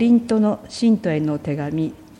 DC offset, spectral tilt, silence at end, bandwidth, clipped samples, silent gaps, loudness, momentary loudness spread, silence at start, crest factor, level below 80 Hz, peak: under 0.1%; -7.5 dB/octave; 0.15 s; 10.5 kHz; under 0.1%; none; -20 LUFS; 8 LU; 0 s; 12 dB; -54 dBFS; -6 dBFS